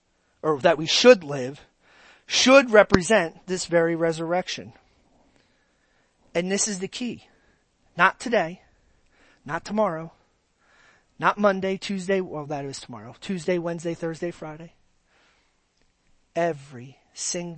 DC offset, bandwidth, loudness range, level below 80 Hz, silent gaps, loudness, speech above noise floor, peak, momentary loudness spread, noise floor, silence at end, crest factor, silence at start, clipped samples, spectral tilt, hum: under 0.1%; 8.8 kHz; 13 LU; -56 dBFS; none; -23 LUFS; 44 dB; 0 dBFS; 21 LU; -67 dBFS; 0 s; 24 dB; 0.45 s; under 0.1%; -3.5 dB/octave; none